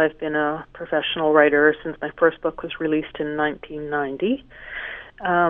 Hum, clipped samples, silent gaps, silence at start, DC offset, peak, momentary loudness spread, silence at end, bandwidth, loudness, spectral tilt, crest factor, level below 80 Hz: none; under 0.1%; none; 0 s; under 0.1%; -2 dBFS; 15 LU; 0 s; 3.8 kHz; -22 LUFS; -8.5 dB/octave; 20 dB; -52 dBFS